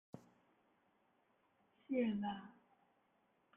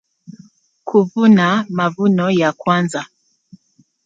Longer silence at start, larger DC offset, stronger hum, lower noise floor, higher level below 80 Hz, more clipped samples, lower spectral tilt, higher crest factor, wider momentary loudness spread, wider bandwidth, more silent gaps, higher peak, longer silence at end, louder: second, 0.15 s vs 0.3 s; neither; neither; first, -78 dBFS vs -57 dBFS; second, -86 dBFS vs -62 dBFS; neither; first, -8.5 dB/octave vs -6.5 dB/octave; about the same, 20 dB vs 16 dB; first, 21 LU vs 13 LU; second, 3.7 kHz vs 9.2 kHz; neither; second, -26 dBFS vs -2 dBFS; about the same, 1.05 s vs 1 s; second, -42 LUFS vs -15 LUFS